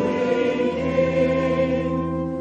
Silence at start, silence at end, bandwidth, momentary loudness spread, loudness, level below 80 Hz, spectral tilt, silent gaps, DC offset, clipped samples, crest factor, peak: 0 s; 0 s; 7.8 kHz; 4 LU; -22 LUFS; -44 dBFS; -7.5 dB/octave; none; under 0.1%; under 0.1%; 14 dB; -8 dBFS